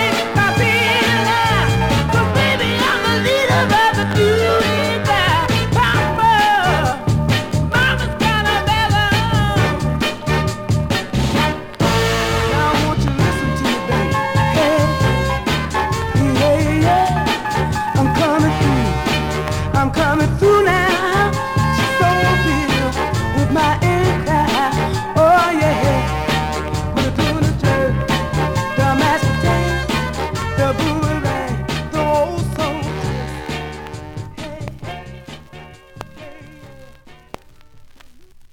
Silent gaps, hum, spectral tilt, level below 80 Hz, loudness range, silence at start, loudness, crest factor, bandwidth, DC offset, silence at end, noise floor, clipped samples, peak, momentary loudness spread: none; none; -5.5 dB/octave; -30 dBFS; 7 LU; 0 s; -16 LUFS; 12 dB; 17.5 kHz; under 0.1%; 0.1 s; -42 dBFS; under 0.1%; -4 dBFS; 8 LU